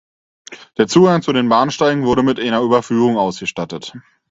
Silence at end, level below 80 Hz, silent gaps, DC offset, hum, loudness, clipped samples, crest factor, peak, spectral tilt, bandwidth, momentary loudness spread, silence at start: 0.3 s; -52 dBFS; none; under 0.1%; none; -15 LUFS; under 0.1%; 16 dB; 0 dBFS; -5.5 dB/octave; 8 kHz; 14 LU; 0.5 s